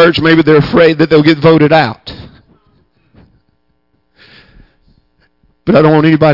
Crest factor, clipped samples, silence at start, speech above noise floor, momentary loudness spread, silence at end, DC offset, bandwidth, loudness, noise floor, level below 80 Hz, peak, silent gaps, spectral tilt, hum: 10 dB; under 0.1%; 0 s; 53 dB; 11 LU; 0 s; under 0.1%; 5.8 kHz; -8 LUFS; -60 dBFS; -40 dBFS; 0 dBFS; none; -8.5 dB/octave; none